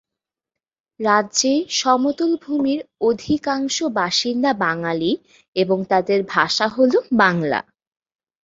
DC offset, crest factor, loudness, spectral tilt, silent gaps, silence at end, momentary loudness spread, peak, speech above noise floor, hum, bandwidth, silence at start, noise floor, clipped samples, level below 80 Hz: under 0.1%; 18 dB; -19 LUFS; -3.5 dB/octave; 5.48-5.53 s; 0.85 s; 6 LU; -2 dBFS; 67 dB; none; 7.8 kHz; 1 s; -86 dBFS; under 0.1%; -60 dBFS